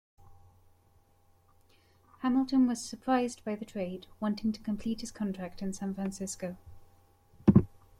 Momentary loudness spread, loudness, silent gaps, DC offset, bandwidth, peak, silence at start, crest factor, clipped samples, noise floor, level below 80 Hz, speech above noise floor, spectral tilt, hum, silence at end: 13 LU; -32 LUFS; none; under 0.1%; 14.5 kHz; -8 dBFS; 0.25 s; 26 dB; under 0.1%; -65 dBFS; -56 dBFS; 33 dB; -6.5 dB/octave; none; 0.2 s